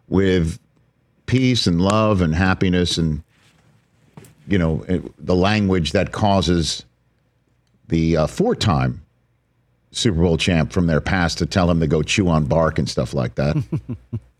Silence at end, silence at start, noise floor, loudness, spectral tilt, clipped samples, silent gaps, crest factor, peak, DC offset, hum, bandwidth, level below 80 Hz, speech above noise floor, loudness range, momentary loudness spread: 0.2 s; 0.1 s; -63 dBFS; -19 LUFS; -6 dB/octave; under 0.1%; none; 16 dB; -4 dBFS; under 0.1%; none; 12 kHz; -36 dBFS; 45 dB; 3 LU; 8 LU